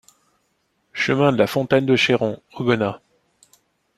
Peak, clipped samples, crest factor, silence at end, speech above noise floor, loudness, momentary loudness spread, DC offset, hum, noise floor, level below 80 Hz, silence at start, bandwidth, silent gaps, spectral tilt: -2 dBFS; under 0.1%; 20 dB; 1 s; 50 dB; -19 LUFS; 9 LU; under 0.1%; none; -68 dBFS; -58 dBFS; 0.95 s; 14.5 kHz; none; -6 dB/octave